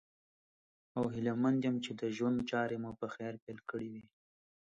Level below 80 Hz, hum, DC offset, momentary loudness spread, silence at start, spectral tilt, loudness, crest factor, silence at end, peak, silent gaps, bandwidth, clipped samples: -70 dBFS; none; under 0.1%; 12 LU; 0.95 s; -7 dB/octave; -37 LUFS; 16 dB; 0.65 s; -22 dBFS; 3.42-3.47 s; 7.8 kHz; under 0.1%